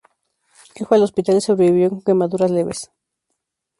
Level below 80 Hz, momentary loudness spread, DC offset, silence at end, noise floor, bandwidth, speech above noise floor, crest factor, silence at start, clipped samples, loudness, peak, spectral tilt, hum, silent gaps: -60 dBFS; 14 LU; under 0.1%; 0.95 s; -76 dBFS; 11.5 kHz; 60 dB; 16 dB; 0.8 s; under 0.1%; -17 LUFS; -2 dBFS; -6.5 dB/octave; none; none